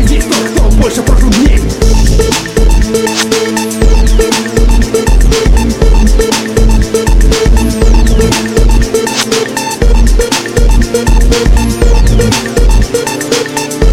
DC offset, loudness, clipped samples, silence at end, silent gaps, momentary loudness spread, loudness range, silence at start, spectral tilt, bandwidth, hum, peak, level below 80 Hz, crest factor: under 0.1%; -10 LUFS; 0.3%; 0 s; none; 2 LU; 1 LU; 0 s; -4.5 dB/octave; 15 kHz; none; 0 dBFS; -8 dBFS; 6 dB